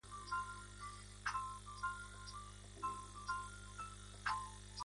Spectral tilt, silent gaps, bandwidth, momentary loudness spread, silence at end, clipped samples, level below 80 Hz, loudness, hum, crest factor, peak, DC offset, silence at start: -2.5 dB/octave; none; 11.5 kHz; 9 LU; 0 s; under 0.1%; -60 dBFS; -47 LUFS; 50 Hz at -55 dBFS; 20 dB; -28 dBFS; under 0.1%; 0.05 s